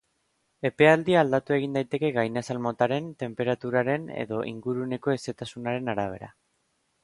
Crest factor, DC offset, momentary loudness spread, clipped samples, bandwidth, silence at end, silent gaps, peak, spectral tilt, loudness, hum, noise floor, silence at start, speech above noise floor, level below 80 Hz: 22 dB; under 0.1%; 11 LU; under 0.1%; 11.5 kHz; 0.75 s; none; -6 dBFS; -6.5 dB/octave; -26 LUFS; none; -73 dBFS; 0.65 s; 47 dB; -64 dBFS